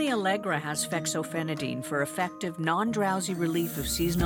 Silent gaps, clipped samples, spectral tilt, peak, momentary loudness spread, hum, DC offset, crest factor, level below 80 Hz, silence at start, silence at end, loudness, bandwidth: none; under 0.1%; -4.5 dB/octave; -12 dBFS; 4 LU; none; under 0.1%; 16 dB; -50 dBFS; 0 s; 0 s; -29 LUFS; over 20 kHz